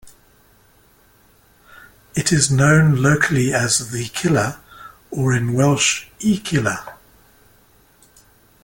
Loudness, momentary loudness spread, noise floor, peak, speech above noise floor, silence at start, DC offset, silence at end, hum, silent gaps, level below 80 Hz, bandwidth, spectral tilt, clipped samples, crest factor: -17 LUFS; 12 LU; -54 dBFS; -2 dBFS; 37 dB; 0.05 s; under 0.1%; 1.7 s; none; none; -48 dBFS; 17 kHz; -4.5 dB/octave; under 0.1%; 18 dB